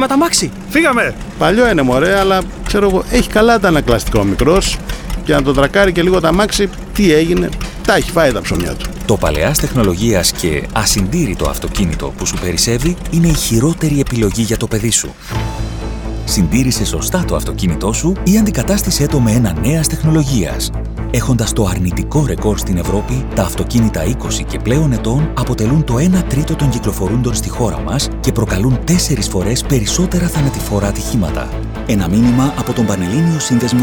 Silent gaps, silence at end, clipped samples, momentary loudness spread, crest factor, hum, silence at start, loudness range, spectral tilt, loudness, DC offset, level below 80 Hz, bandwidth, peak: none; 0 s; under 0.1%; 7 LU; 14 dB; none; 0 s; 3 LU; -5 dB/octave; -14 LUFS; 0.1%; -24 dBFS; over 20 kHz; 0 dBFS